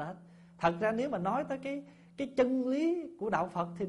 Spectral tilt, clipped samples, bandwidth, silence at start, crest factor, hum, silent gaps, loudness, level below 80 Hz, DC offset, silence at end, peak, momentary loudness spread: -7 dB/octave; under 0.1%; 11.5 kHz; 0 s; 18 dB; none; none; -33 LUFS; -66 dBFS; under 0.1%; 0 s; -14 dBFS; 12 LU